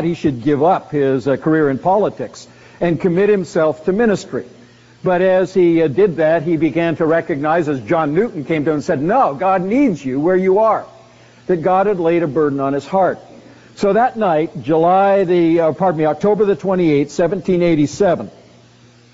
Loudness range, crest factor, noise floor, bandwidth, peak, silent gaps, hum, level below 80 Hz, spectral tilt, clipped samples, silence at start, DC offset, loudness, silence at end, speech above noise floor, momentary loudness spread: 2 LU; 12 dB; -47 dBFS; 8 kHz; -4 dBFS; none; none; -50 dBFS; -6.5 dB/octave; under 0.1%; 0 s; under 0.1%; -16 LUFS; 0.85 s; 32 dB; 6 LU